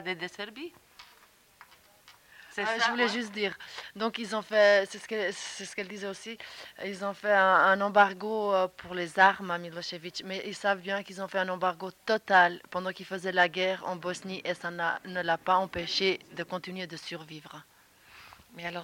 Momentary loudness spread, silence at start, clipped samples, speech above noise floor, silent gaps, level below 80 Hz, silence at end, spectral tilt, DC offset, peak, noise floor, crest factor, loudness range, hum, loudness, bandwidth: 17 LU; 0 s; under 0.1%; 31 dB; none; -70 dBFS; 0 s; -3.5 dB/octave; under 0.1%; -10 dBFS; -60 dBFS; 22 dB; 7 LU; none; -29 LUFS; 17 kHz